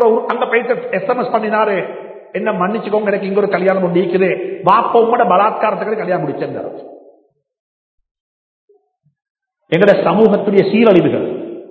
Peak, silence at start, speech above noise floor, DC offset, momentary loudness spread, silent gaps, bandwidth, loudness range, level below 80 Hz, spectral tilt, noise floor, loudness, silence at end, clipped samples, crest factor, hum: 0 dBFS; 0 s; 45 dB; under 0.1%; 12 LU; 7.60-7.98 s, 8.11-8.68 s, 9.30-9.35 s; 5.2 kHz; 11 LU; -62 dBFS; -9 dB/octave; -59 dBFS; -14 LUFS; 0.05 s; under 0.1%; 16 dB; none